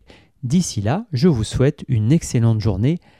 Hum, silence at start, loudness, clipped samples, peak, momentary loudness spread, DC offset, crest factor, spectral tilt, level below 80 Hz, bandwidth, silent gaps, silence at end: none; 0.45 s; -19 LUFS; under 0.1%; -4 dBFS; 4 LU; under 0.1%; 14 dB; -6.5 dB/octave; -38 dBFS; 13 kHz; none; 0.2 s